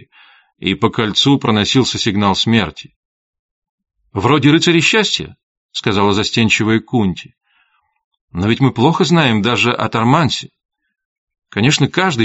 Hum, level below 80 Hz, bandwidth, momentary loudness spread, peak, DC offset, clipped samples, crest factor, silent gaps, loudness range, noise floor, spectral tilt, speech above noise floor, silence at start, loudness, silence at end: none; -48 dBFS; 8 kHz; 10 LU; 0 dBFS; under 0.1%; under 0.1%; 16 dB; 2.96-3.33 s, 3.39-3.62 s, 3.69-3.78 s, 5.43-5.69 s, 8.04-8.11 s, 8.21-8.28 s, 10.65-10.69 s, 11.05-11.27 s; 3 LU; -60 dBFS; -4 dB/octave; 46 dB; 0.6 s; -14 LUFS; 0 s